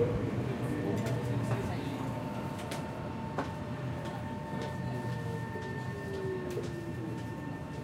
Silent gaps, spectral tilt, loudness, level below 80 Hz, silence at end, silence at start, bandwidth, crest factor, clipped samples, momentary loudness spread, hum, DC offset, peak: none; -7 dB/octave; -37 LUFS; -54 dBFS; 0 s; 0 s; 16 kHz; 18 dB; under 0.1%; 6 LU; none; under 0.1%; -18 dBFS